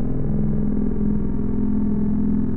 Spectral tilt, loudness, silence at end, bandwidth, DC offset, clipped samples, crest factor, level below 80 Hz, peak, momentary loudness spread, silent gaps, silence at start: -14.5 dB/octave; -23 LUFS; 0 s; 2.4 kHz; 7%; under 0.1%; 10 dB; -28 dBFS; -10 dBFS; 2 LU; none; 0 s